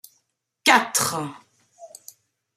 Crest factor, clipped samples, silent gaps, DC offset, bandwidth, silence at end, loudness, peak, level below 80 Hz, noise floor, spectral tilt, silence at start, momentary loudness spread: 24 dB; under 0.1%; none; under 0.1%; 16 kHz; 0.7 s; -20 LUFS; -2 dBFS; -74 dBFS; -72 dBFS; -1.5 dB/octave; 0.65 s; 25 LU